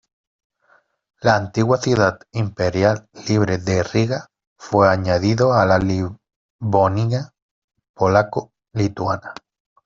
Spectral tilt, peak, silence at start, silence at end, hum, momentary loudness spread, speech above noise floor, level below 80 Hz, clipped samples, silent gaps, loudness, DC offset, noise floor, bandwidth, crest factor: -6.5 dB/octave; -2 dBFS; 1.25 s; 0.5 s; none; 11 LU; 41 dB; -50 dBFS; under 0.1%; 4.47-4.56 s, 6.36-6.59 s, 7.42-7.68 s, 7.89-7.94 s; -19 LUFS; under 0.1%; -59 dBFS; 7.6 kHz; 18 dB